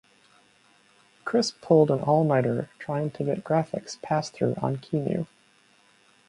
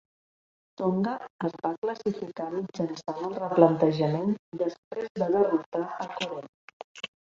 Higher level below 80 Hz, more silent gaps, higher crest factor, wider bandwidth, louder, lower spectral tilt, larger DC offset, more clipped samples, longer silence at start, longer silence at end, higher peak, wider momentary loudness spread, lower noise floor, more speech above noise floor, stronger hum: about the same, -66 dBFS vs -70 dBFS; second, none vs 1.30-1.39 s, 1.78-1.82 s, 4.39-4.52 s, 4.78-4.91 s, 5.10-5.15 s, 5.66-5.72 s, 6.49-6.95 s; about the same, 20 dB vs 24 dB; first, 11.5 kHz vs 7.6 kHz; about the same, -26 LUFS vs -28 LUFS; about the same, -6.5 dB/octave vs -7.5 dB/octave; neither; neither; first, 1.25 s vs 0.8 s; first, 1.05 s vs 0.25 s; about the same, -6 dBFS vs -4 dBFS; about the same, 11 LU vs 13 LU; second, -61 dBFS vs under -90 dBFS; second, 36 dB vs over 62 dB; neither